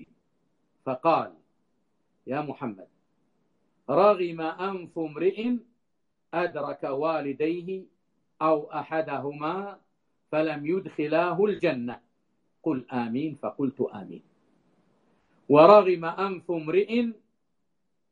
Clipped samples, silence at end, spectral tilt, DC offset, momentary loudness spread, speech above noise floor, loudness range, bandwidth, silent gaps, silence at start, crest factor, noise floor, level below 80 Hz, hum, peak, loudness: under 0.1%; 1 s; -8.5 dB/octave; under 0.1%; 13 LU; 55 dB; 9 LU; 4.9 kHz; none; 0 s; 26 dB; -80 dBFS; -74 dBFS; none; -2 dBFS; -26 LUFS